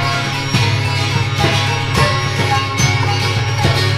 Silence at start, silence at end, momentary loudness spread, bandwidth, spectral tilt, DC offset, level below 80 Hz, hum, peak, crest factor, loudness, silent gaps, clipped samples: 0 s; 0 s; 2 LU; 15 kHz; -4.5 dB/octave; under 0.1%; -34 dBFS; none; 0 dBFS; 14 dB; -15 LUFS; none; under 0.1%